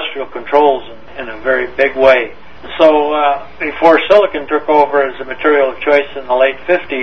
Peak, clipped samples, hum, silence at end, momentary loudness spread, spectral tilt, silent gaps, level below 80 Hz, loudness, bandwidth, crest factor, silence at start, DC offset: 0 dBFS; 0.3%; none; 0 s; 12 LU; -5.5 dB/octave; none; -46 dBFS; -12 LUFS; 6.4 kHz; 12 dB; 0 s; 3%